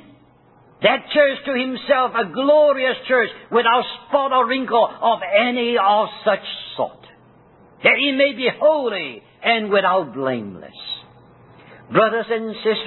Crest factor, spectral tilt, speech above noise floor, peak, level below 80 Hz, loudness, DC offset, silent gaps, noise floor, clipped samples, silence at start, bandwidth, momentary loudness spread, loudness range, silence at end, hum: 18 dB; -9 dB/octave; 34 dB; -2 dBFS; -64 dBFS; -18 LUFS; under 0.1%; none; -52 dBFS; under 0.1%; 0.8 s; 4.3 kHz; 11 LU; 4 LU; 0 s; none